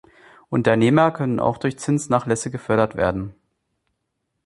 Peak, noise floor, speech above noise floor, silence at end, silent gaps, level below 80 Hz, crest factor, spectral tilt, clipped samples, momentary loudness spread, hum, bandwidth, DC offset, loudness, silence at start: -2 dBFS; -76 dBFS; 56 dB; 1.15 s; none; -50 dBFS; 20 dB; -6.5 dB/octave; under 0.1%; 9 LU; none; 11.5 kHz; under 0.1%; -20 LUFS; 0.5 s